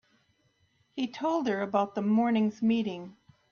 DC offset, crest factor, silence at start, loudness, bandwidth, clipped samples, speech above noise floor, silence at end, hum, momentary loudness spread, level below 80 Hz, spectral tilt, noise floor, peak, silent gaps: under 0.1%; 18 dB; 0.95 s; -29 LUFS; 6.8 kHz; under 0.1%; 42 dB; 0.4 s; none; 14 LU; -72 dBFS; -7 dB/octave; -70 dBFS; -12 dBFS; none